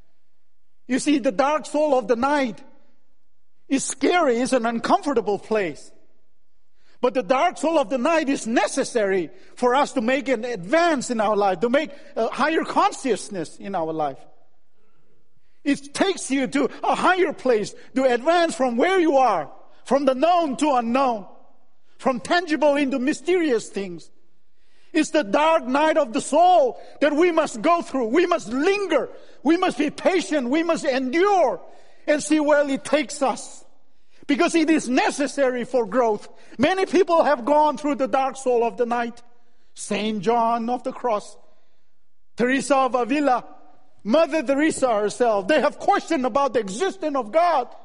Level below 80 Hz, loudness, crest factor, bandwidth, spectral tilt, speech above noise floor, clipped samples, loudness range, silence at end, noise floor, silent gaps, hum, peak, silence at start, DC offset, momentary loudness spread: -62 dBFS; -21 LUFS; 18 dB; 10.5 kHz; -4 dB/octave; 55 dB; under 0.1%; 4 LU; 0.1 s; -76 dBFS; none; none; -4 dBFS; 0.9 s; 0.9%; 8 LU